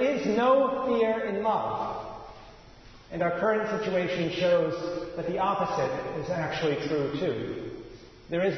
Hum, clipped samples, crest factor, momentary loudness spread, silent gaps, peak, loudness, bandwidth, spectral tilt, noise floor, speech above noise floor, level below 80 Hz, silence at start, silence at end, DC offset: none; under 0.1%; 16 dB; 13 LU; none; -12 dBFS; -28 LUFS; 6.4 kHz; -6.5 dB/octave; -50 dBFS; 23 dB; -56 dBFS; 0 s; 0 s; under 0.1%